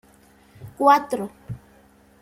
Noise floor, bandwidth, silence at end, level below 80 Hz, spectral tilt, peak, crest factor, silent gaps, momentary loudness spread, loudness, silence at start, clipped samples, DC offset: -54 dBFS; 16 kHz; 0.65 s; -58 dBFS; -5.5 dB/octave; -4 dBFS; 22 dB; none; 22 LU; -20 LUFS; 0.6 s; under 0.1%; under 0.1%